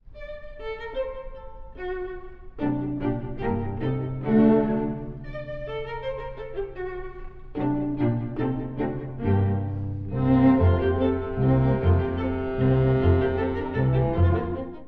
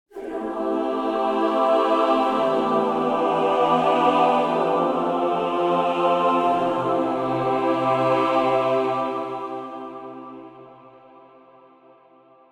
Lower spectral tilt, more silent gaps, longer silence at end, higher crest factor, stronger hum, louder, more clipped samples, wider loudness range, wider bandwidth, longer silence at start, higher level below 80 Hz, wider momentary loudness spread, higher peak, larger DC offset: first, -11.5 dB/octave vs -6.5 dB/octave; neither; second, 0 s vs 1.65 s; about the same, 18 dB vs 16 dB; neither; second, -25 LUFS vs -21 LUFS; neither; about the same, 9 LU vs 8 LU; second, 4.7 kHz vs 12 kHz; about the same, 0.05 s vs 0.15 s; first, -38 dBFS vs -60 dBFS; first, 17 LU vs 13 LU; about the same, -8 dBFS vs -6 dBFS; neither